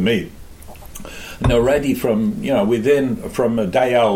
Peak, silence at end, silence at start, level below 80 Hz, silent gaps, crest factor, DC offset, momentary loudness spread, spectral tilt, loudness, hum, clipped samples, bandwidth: -4 dBFS; 0 s; 0 s; -34 dBFS; none; 14 dB; under 0.1%; 18 LU; -6 dB/octave; -18 LUFS; none; under 0.1%; 16.5 kHz